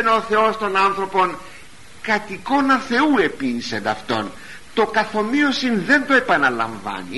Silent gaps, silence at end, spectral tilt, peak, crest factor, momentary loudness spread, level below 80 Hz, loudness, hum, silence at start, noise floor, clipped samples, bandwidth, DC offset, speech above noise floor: none; 0 s; -4.5 dB/octave; -4 dBFS; 16 dB; 9 LU; -52 dBFS; -19 LUFS; none; 0 s; -44 dBFS; under 0.1%; 11.5 kHz; 1%; 25 dB